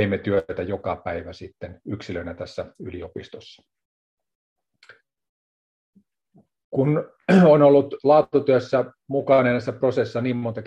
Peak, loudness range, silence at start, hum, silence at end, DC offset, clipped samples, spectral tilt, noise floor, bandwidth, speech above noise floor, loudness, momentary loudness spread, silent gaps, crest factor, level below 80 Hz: -4 dBFS; 20 LU; 0 s; none; 0 s; under 0.1%; under 0.1%; -8.5 dB/octave; -60 dBFS; 8.2 kHz; 39 dB; -20 LUFS; 20 LU; 3.85-4.17 s, 4.35-4.56 s, 5.29-5.93 s, 6.64-6.72 s; 18 dB; -60 dBFS